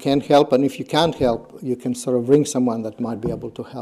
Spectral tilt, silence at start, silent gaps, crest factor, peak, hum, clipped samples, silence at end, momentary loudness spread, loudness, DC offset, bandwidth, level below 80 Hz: -5.5 dB/octave; 0 s; none; 18 dB; -2 dBFS; none; under 0.1%; 0 s; 11 LU; -20 LUFS; under 0.1%; 15 kHz; -50 dBFS